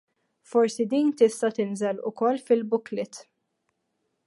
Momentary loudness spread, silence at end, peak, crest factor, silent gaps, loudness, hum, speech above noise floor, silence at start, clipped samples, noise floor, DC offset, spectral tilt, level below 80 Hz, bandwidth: 11 LU; 1.05 s; -8 dBFS; 20 dB; none; -25 LUFS; none; 52 dB; 0.55 s; under 0.1%; -77 dBFS; under 0.1%; -5.5 dB/octave; -82 dBFS; 11.5 kHz